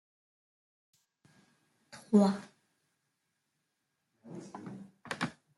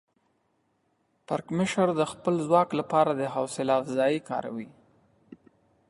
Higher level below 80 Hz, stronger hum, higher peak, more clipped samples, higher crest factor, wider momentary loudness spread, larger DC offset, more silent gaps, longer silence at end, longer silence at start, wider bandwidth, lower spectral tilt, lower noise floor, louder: second, -80 dBFS vs -68 dBFS; neither; second, -14 dBFS vs -8 dBFS; neither; about the same, 24 dB vs 20 dB; first, 24 LU vs 10 LU; neither; neither; second, 0.25 s vs 0.55 s; first, 1.95 s vs 1.3 s; about the same, 12 kHz vs 11.5 kHz; about the same, -7 dB/octave vs -6 dB/octave; first, -83 dBFS vs -72 dBFS; second, -31 LUFS vs -27 LUFS